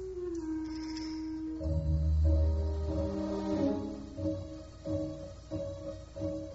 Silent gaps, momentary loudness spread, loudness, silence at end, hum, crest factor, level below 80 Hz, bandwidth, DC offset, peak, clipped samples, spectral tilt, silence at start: none; 12 LU; -35 LUFS; 0 s; none; 16 dB; -38 dBFS; 7.8 kHz; under 0.1%; -18 dBFS; under 0.1%; -9 dB/octave; 0 s